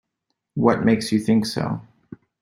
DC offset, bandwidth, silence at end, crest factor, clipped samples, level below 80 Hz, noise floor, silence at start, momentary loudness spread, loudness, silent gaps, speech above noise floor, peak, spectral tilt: under 0.1%; 15.5 kHz; 0.6 s; 20 dB; under 0.1%; -56 dBFS; -78 dBFS; 0.55 s; 12 LU; -21 LUFS; none; 58 dB; -2 dBFS; -6 dB/octave